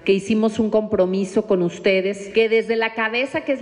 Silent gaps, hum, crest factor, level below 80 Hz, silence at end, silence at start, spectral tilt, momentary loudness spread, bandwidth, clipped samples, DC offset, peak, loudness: none; none; 12 dB; -56 dBFS; 0 s; 0.05 s; -5.5 dB/octave; 4 LU; 10.5 kHz; under 0.1%; under 0.1%; -8 dBFS; -20 LUFS